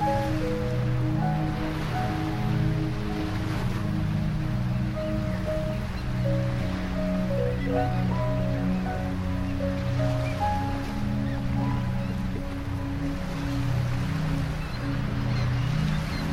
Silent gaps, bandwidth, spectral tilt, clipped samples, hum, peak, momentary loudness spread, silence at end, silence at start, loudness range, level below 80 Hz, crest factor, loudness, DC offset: none; 15 kHz; -7.5 dB/octave; under 0.1%; none; -12 dBFS; 4 LU; 0 s; 0 s; 2 LU; -34 dBFS; 14 dB; -28 LUFS; under 0.1%